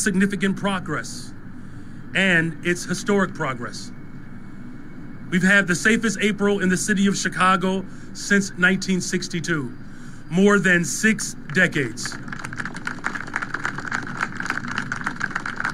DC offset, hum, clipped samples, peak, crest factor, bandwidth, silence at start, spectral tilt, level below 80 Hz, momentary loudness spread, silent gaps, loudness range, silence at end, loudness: under 0.1%; none; under 0.1%; -4 dBFS; 18 dB; 14.5 kHz; 0 s; -4.5 dB/octave; -42 dBFS; 22 LU; none; 6 LU; 0 s; -22 LUFS